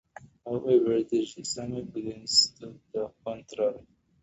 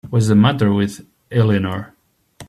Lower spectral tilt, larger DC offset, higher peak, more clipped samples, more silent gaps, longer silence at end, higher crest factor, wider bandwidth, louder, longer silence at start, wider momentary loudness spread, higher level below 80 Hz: second, -3.5 dB/octave vs -7 dB/octave; neither; second, -8 dBFS vs -2 dBFS; neither; neither; first, 0.4 s vs 0.05 s; first, 22 dB vs 16 dB; second, 8.2 kHz vs 13 kHz; second, -28 LUFS vs -17 LUFS; first, 0.2 s vs 0.05 s; first, 16 LU vs 13 LU; second, -64 dBFS vs -52 dBFS